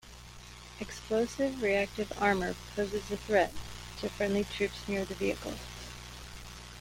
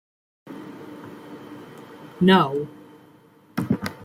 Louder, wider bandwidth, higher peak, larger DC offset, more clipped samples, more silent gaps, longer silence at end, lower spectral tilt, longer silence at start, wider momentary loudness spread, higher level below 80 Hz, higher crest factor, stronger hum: second, -33 LUFS vs -21 LUFS; about the same, 16.5 kHz vs 15 kHz; second, -12 dBFS vs -6 dBFS; neither; neither; neither; about the same, 0 s vs 0 s; second, -4.5 dB/octave vs -7 dB/octave; second, 0.05 s vs 0.45 s; second, 17 LU vs 25 LU; first, -50 dBFS vs -62 dBFS; about the same, 22 dB vs 20 dB; first, 60 Hz at -50 dBFS vs none